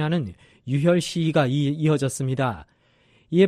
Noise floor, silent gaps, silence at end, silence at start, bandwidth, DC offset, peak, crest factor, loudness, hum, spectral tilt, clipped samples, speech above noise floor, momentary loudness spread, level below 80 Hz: -60 dBFS; none; 0 s; 0 s; 13.5 kHz; under 0.1%; -6 dBFS; 16 dB; -23 LUFS; none; -6.5 dB/octave; under 0.1%; 37 dB; 10 LU; -56 dBFS